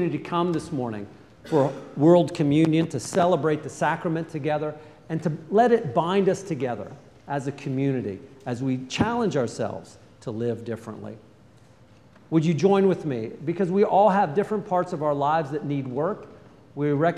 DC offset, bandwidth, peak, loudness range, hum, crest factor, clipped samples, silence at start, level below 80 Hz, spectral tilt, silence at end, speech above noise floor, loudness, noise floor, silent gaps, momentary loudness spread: under 0.1%; 12 kHz; -4 dBFS; 6 LU; none; 20 dB; under 0.1%; 0 s; -62 dBFS; -7 dB/octave; 0 s; 30 dB; -24 LUFS; -53 dBFS; none; 15 LU